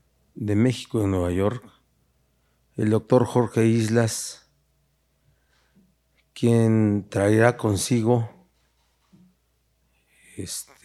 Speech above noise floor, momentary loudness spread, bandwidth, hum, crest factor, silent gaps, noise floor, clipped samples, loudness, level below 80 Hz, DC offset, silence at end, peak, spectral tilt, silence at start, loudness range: 47 dB; 15 LU; 13.5 kHz; none; 22 dB; none; -68 dBFS; under 0.1%; -22 LUFS; -56 dBFS; under 0.1%; 0.25 s; -2 dBFS; -6 dB/octave; 0.4 s; 4 LU